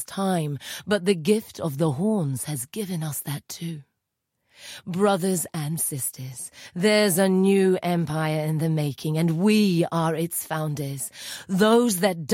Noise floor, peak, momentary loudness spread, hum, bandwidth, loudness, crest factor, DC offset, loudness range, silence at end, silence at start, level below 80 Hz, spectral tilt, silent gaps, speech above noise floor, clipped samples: -80 dBFS; -6 dBFS; 14 LU; none; 16.5 kHz; -24 LUFS; 18 dB; under 0.1%; 7 LU; 0 s; 0 s; -66 dBFS; -5 dB/octave; none; 56 dB; under 0.1%